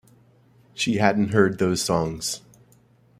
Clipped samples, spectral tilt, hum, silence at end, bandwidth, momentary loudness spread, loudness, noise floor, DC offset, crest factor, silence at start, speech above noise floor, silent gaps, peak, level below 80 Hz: under 0.1%; -4.5 dB/octave; none; 0.8 s; 15.5 kHz; 10 LU; -22 LUFS; -57 dBFS; under 0.1%; 22 dB; 0.75 s; 35 dB; none; -2 dBFS; -54 dBFS